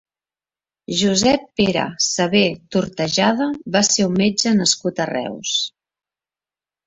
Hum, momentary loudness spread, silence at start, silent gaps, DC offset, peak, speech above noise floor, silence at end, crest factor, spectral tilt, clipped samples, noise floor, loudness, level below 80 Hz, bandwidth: none; 7 LU; 0.9 s; none; under 0.1%; -2 dBFS; over 72 dB; 1.2 s; 18 dB; -3.5 dB/octave; under 0.1%; under -90 dBFS; -18 LUFS; -54 dBFS; 8.2 kHz